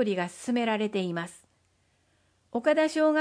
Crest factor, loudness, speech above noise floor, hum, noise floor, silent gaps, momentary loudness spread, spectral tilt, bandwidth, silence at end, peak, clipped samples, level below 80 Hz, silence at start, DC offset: 16 dB; -28 LUFS; 42 dB; none; -69 dBFS; none; 12 LU; -5.5 dB/octave; 10.5 kHz; 0 s; -12 dBFS; under 0.1%; -76 dBFS; 0 s; under 0.1%